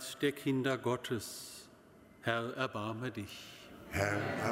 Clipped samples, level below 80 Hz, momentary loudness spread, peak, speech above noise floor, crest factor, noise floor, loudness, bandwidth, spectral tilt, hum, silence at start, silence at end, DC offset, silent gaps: under 0.1%; -64 dBFS; 15 LU; -16 dBFS; 24 dB; 22 dB; -60 dBFS; -37 LUFS; 16 kHz; -5 dB/octave; none; 0 s; 0 s; under 0.1%; none